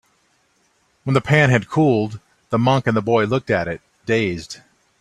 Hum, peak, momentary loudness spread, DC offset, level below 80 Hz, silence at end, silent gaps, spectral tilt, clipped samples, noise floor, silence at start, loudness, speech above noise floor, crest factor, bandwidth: none; 0 dBFS; 16 LU; under 0.1%; -52 dBFS; 0.45 s; none; -6.5 dB/octave; under 0.1%; -62 dBFS; 1.05 s; -19 LUFS; 45 dB; 18 dB; 11.5 kHz